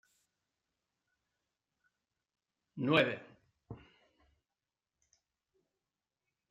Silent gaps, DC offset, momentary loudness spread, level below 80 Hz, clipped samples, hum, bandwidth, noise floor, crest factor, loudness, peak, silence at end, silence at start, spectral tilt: none; under 0.1%; 24 LU; -78 dBFS; under 0.1%; none; 9 kHz; under -90 dBFS; 28 dB; -32 LUFS; -14 dBFS; 2.75 s; 2.75 s; -6.5 dB/octave